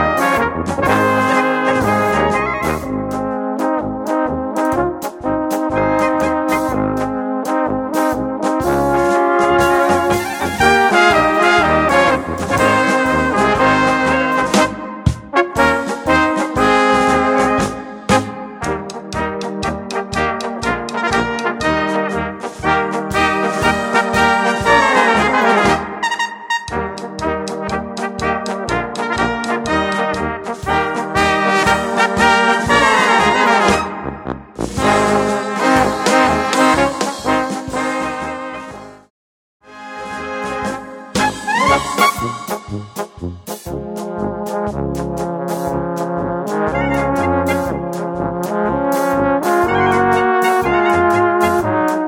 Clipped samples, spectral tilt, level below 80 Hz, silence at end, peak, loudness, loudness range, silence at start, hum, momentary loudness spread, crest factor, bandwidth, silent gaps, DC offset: under 0.1%; -4.5 dB/octave; -38 dBFS; 0 s; 0 dBFS; -16 LUFS; 7 LU; 0 s; none; 11 LU; 16 dB; 17.5 kHz; 39.10-39.60 s; under 0.1%